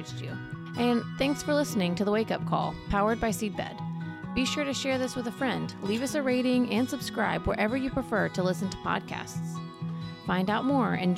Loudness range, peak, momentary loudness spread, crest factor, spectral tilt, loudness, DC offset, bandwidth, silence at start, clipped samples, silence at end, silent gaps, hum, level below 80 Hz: 2 LU; -14 dBFS; 10 LU; 16 dB; -5.5 dB/octave; -29 LUFS; under 0.1%; 15.5 kHz; 0 s; under 0.1%; 0 s; none; none; -50 dBFS